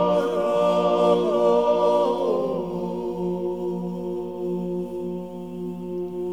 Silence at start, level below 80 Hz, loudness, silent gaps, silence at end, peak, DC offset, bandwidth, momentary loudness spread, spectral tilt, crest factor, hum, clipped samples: 0 s; -58 dBFS; -24 LUFS; none; 0 s; -8 dBFS; 0.3%; 12.5 kHz; 12 LU; -7.5 dB/octave; 16 dB; none; under 0.1%